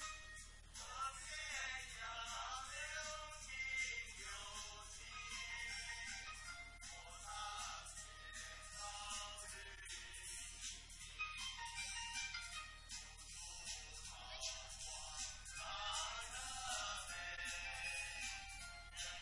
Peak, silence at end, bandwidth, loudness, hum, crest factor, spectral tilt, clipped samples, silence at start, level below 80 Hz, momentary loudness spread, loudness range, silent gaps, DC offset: -30 dBFS; 0 s; 11.5 kHz; -48 LUFS; none; 18 dB; 0.5 dB/octave; under 0.1%; 0 s; -62 dBFS; 8 LU; 4 LU; none; under 0.1%